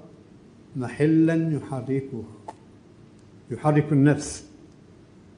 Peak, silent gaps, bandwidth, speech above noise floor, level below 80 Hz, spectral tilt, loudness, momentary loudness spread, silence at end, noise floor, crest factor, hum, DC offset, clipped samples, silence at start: -6 dBFS; none; 10 kHz; 28 dB; -58 dBFS; -7.5 dB/octave; -23 LUFS; 19 LU; 0.9 s; -50 dBFS; 18 dB; none; under 0.1%; under 0.1%; 0.05 s